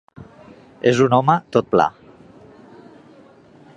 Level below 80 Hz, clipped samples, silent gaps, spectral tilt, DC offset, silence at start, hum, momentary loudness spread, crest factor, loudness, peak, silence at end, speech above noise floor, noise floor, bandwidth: -58 dBFS; under 0.1%; none; -6.5 dB/octave; under 0.1%; 0.2 s; none; 6 LU; 20 dB; -17 LUFS; 0 dBFS; 1.9 s; 31 dB; -47 dBFS; 9.6 kHz